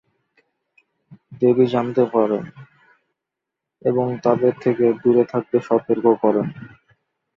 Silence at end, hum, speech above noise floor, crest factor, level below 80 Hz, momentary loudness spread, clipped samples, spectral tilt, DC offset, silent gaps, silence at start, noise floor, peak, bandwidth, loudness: 0.7 s; none; 65 dB; 18 dB; -64 dBFS; 8 LU; under 0.1%; -9 dB/octave; under 0.1%; none; 1.1 s; -83 dBFS; -2 dBFS; 6.2 kHz; -19 LUFS